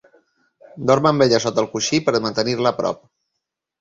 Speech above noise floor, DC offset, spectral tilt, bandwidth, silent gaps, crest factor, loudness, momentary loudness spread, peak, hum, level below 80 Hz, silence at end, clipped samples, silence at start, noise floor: 62 dB; under 0.1%; -4.5 dB/octave; 7.8 kHz; none; 18 dB; -19 LUFS; 10 LU; -2 dBFS; none; -56 dBFS; 0.85 s; under 0.1%; 0.75 s; -80 dBFS